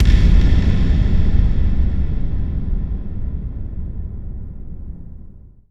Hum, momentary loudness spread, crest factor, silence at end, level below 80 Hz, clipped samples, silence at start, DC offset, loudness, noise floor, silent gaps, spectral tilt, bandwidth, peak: none; 19 LU; 14 dB; 0.35 s; -18 dBFS; under 0.1%; 0 s; under 0.1%; -20 LUFS; -39 dBFS; none; -8 dB/octave; 6.2 kHz; -2 dBFS